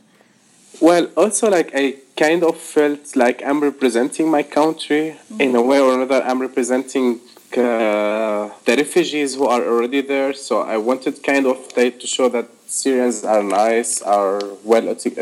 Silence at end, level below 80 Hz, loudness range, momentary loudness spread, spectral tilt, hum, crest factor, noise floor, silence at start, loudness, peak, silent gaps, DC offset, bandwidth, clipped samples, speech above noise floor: 0 s; -74 dBFS; 2 LU; 6 LU; -3.5 dB/octave; none; 18 dB; -53 dBFS; 0.75 s; -18 LUFS; 0 dBFS; none; under 0.1%; 15.5 kHz; under 0.1%; 36 dB